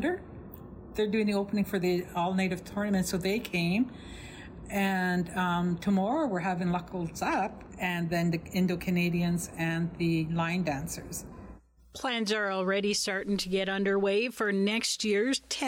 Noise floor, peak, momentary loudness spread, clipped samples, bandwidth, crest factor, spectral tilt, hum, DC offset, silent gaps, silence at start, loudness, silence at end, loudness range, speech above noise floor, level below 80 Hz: -51 dBFS; -18 dBFS; 11 LU; under 0.1%; 16.5 kHz; 12 dB; -5 dB/octave; none; under 0.1%; none; 0 s; -30 LUFS; 0 s; 3 LU; 22 dB; -54 dBFS